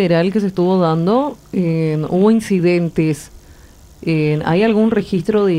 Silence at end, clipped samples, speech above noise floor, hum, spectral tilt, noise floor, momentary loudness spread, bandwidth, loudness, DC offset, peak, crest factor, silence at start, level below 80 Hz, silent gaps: 0 s; under 0.1%; 27 dB; none; -7.5 dB/octave; -42 dBFS; 6 LU; 14.5 kHz; -16 LUFS; under 0.1%; -2 dBFS; 14 dB; 0 s; -46 dBFS; none